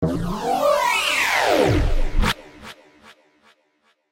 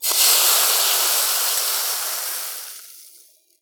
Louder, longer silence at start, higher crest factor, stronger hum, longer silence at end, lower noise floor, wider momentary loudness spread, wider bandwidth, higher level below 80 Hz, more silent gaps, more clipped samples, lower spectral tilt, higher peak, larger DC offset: second, -20 LUFS vs -16 LUFS; about the same, 0 s vs 0 s; about the same, 16 dB vs 18 dB; neither; first, 1.4 s vs 0.55 s; first, -65 dBFS vs -52 dBFS; about the same, 16 LU vs 16 LU; second, 16 kHz vs over 20 kHz; first, -26 dBFS vs under -90 dBFS; neither; neither; first, -4 dB/octave vs 7.5 dB/octave; second, -6 dBFS vs -2 dBFS; neither